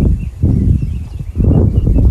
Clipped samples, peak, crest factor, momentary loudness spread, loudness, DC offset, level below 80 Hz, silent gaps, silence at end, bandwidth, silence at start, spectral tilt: under 0.1%; 0 dBFS; 10 dB; 11 LU; -14 LUFS; under 0.1%; -16 dBFS; none; 0 s; 3.1 kHz; 0 s; -11 dB/octave